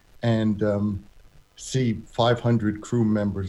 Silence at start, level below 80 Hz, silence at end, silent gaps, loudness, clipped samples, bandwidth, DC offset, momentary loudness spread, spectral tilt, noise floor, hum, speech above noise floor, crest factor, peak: 0.2 s; -50 dBFS; 0 s; none; -24 LUFS; under 0.1%; 11.5 kHz; under 0.1%; 7 LU; -6.5 dB/octave; -51 dBFS; none; 28 dB; 16 dB; -8 dBFS